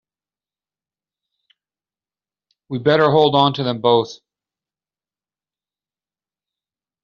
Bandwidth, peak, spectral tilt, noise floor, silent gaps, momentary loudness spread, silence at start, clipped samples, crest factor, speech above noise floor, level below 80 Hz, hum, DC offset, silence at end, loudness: 7 kHz; -2 dBFS; -4 dB/octave; under -90 dBFS; none; 11 LU; 2.7 s; under 0.1%; 20 dB; over 74 dB; -64 dBFS; 50 Hz at -70 dBFS; under 0.1%; 2.9 s; -16 LUFS